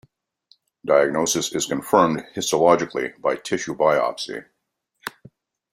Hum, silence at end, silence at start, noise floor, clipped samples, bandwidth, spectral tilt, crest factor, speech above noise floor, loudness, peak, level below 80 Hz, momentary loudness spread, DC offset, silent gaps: none; 0.65 s; 0.85 s; -76 dBFS; under 0.1%; 16 kHz; -3.5 dB/octave; 20 dB; 56 dB; -21 LUFS; -2 dBFS; -62 dBFS; 18 LU; under 0.1%; none